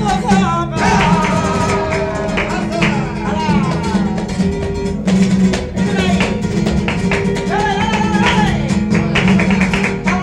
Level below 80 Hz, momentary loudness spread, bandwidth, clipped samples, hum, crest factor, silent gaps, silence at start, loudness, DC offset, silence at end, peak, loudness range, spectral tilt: -30 dBFS; 5 LU; 11 kHz; under 0.1%; none; 14 dB; none; 0 s; -15 LUFS; under 0.1%; 0 s; -2 dBFS; 2 LU; -6 dB/octave